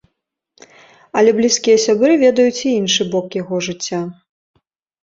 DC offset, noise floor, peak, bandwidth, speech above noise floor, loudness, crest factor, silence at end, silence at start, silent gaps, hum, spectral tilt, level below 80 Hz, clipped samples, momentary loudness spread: under 0.1%; -74 dBFS; 0 dBFS; 7.8 kHz; 60 dB; -15 LUFS; 16 dB; 0.9 s; 1.15 s; none; none; -3.5 dB/octave; -60 dBFS; under 0.1%; 11 LU